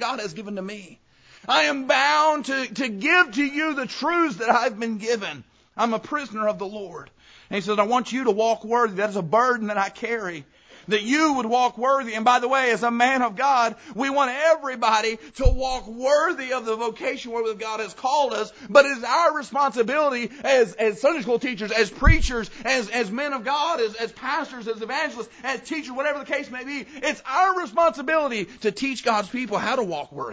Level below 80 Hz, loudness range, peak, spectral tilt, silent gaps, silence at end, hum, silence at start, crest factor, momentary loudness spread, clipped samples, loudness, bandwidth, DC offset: -36 dBFS; 5 LU; 0 dBFS; -4 dB/octave; none; 0 s; none; 0 s; 22 dB; 10 LU; under 0.1%; -23 LUFS; 8 kHz; under 0.1%